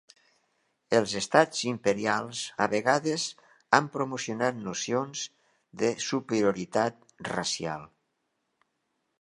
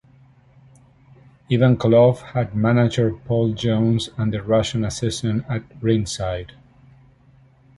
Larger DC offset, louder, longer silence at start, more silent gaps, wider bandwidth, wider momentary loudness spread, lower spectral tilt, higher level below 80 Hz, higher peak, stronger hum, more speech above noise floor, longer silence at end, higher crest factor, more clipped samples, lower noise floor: neither; second, -28 LUFS vs -20 LUFS; second, 0.9 s vs 1.5 s; neither; about the same, 11.5 kHz vs 11.5 kHz; about the same, 10 LU vs 10 LU; second, -3.5 dB/octave vs -6.5 dB/octave; second, -70 dBFS vs -46 dBFS; about the same, -2 dBFS vs -4 dBFS; neither; first, 50 dB vs 34 dB; about the same, 1.35 s vs 1.3 s; first, 28 dB vs 18 dB; neither; first, -78 dBFS vs -53 dBFS